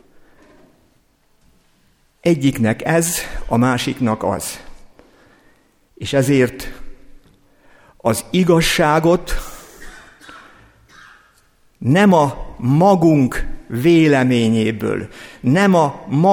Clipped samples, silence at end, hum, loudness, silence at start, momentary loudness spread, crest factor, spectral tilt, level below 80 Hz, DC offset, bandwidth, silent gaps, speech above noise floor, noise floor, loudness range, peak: under 0.1%; 0 s; none; -16 LUFS; 2.25 s; 15 LU; 16 dB; -5.5 dB/octave; -36 dBFS; under 0.1%; 19.5 kHz; none; 43 dB; -58 dBFS; 7 LU; -2 dBFS